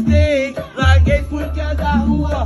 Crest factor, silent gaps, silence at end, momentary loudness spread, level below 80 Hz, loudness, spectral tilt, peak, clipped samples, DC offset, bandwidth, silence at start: 14 dB; none; 0 s; 9 LU; -22 dBFS; -16 LUFS; -7 dB/octave; 0 dBFS; under 0.1%; under 0.1%; 11.5 kHz; 0 s